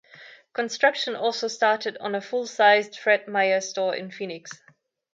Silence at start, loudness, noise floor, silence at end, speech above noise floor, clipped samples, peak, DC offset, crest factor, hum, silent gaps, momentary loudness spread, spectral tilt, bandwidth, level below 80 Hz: 0.2 s; -23 LUFS; -49 dBFS; 0.6 s; 25 dB; under 0.1%; -6 dBFS; under 0.1%; 20 dB; none; none; 16 LU; -2.5 dB/octave; 7.8 kHz; -82 dBFS